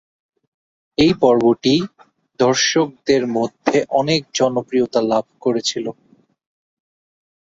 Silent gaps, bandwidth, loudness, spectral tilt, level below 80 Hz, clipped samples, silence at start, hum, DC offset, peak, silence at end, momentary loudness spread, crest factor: none; 7.8 kHz; -18 LUFS; -4.5 dB/octave; -54 dBFS; under 0.1%; 1 s; none; under 0.1%; -2 dBFS; 1.55 s; 7 LU; 18 dB